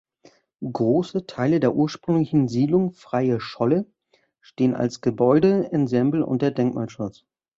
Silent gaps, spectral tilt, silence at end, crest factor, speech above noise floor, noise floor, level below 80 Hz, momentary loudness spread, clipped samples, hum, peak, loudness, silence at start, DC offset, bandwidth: none; -8 dB/octave; 0.5 s; 16 dB; 44 dB; -65 dBFS; -60 dBFS; 10 LU; under 0.1%; none; -6 dBFS; -22 LUFS; 0.6 s; under 0.1%; 7.6 kHz